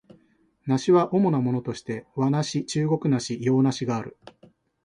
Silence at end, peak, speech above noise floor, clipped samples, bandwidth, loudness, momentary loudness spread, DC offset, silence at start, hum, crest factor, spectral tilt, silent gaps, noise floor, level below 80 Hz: 0.75 s; -6 dBFS; 40 dB; under 0.1%; 11 kHz; -24 LUFS; 12 LU; under 0.1%; 0.65 s; none; 18 dB; -6.5 dB/octave; none; -63 dBFS; -64 dBFS